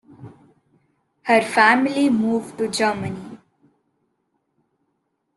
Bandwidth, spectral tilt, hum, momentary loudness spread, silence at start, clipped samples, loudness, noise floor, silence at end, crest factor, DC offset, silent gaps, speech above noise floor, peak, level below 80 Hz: 12.5 kHz; -4.5 dB/octave; none; 17 LU; 0.2 s; under 0.1%; -19 LUFS; -73 dBFS; 2 s; 20 dB; under 0.1%; none; 54 dB; -2 dBFS; -66 dBFS